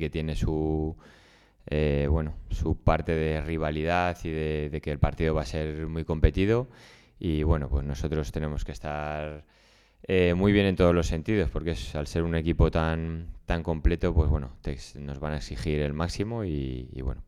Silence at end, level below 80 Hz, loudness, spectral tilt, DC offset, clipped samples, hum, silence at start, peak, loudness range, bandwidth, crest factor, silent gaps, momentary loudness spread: 0.05 s; -34 dBFS; -28 LUFS; -7.5 dB/octave; under 0.1%; under 0.1%; none; 0 s; -6 dBFS; 4 LU; 12 kHz; 20 dB; none; 12 LU